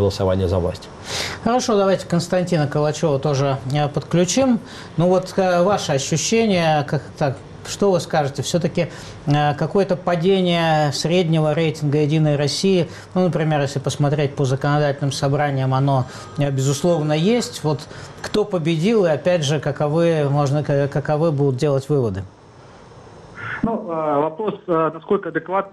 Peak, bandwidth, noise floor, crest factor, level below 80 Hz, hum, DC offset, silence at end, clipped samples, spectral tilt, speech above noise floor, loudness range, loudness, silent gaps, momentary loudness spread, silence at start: -8 dBFS; 13 kHz; -43 dBFS; 12 dB; -50 dBFS; none; under 0.1%; 0.05 s; under 0.1%; -6 dB/octave; 25 dB; 3 LU; -19 LUFS; none; 7 LU; 0 s